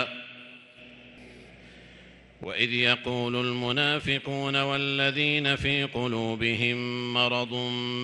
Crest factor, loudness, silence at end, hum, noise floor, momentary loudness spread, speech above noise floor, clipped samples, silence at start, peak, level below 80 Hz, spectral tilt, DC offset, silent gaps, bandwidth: 22 dB; -26 LUFS; 0 s; none; -52 dBFS; 9 LU; 25 dB; under 0.1%; 0 s; -6 dBFS; -56 dBFS; -5 dB/octave; under 0.1%; none; 11.5 kHz